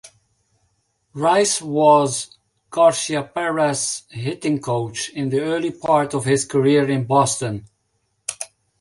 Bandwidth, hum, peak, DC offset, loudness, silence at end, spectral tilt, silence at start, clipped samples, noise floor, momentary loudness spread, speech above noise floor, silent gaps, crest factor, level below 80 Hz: 11.5 kHz; none; -2 dBFS; under 0.1%; -19 LUFS; 0.35 s; -4.5 dB/octave; 0.05 s; under 0.1%; -69 dBFS; 13 LU; 51 dB; none; 18 dB; -60 dBFS